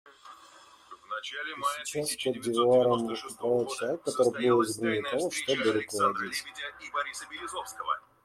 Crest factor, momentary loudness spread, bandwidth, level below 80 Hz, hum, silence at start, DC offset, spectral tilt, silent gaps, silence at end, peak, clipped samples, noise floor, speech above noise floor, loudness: 18 dB; 13 LU; 15 kHz; -70 dBFS; none; 0.05 s; under 0.1%; -3.5 dB/octave; none; 0.25 s; -12 dBFS; under 0.1%; -55 dBFS; 26 dB; -29 LUFS